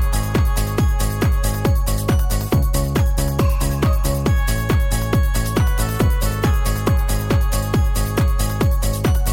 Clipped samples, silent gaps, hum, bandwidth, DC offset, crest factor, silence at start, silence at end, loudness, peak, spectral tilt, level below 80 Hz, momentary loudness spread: under 0.1%; none; none; 17 kHz; 0.3%; 14 dB; 0 s; 0 s; -19 LUFS; -2 dBFS; -5.5 dB/octave; -20 dBFS; 1 LU